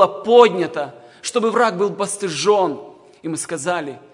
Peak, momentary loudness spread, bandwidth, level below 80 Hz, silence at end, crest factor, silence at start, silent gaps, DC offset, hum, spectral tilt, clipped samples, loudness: 0 dBFS; 16 LU; 11 kHz; -70 dBFS; 0.15 s; 18 dB; 0 s; none; under 0.1%; none; -3.5 dB/octave; under 0.1%; -18 LUFS